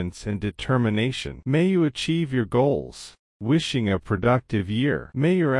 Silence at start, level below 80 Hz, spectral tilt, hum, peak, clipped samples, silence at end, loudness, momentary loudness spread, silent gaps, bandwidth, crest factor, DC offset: 0 s; -48 dBFS; -6.5 dB/octave; none; -8 dBFS; under 0.1%; 0 s; -24 LUFS; 8 LU; 3.19-3.40 s; 11.5 kHz; 16 dB; under 0.1%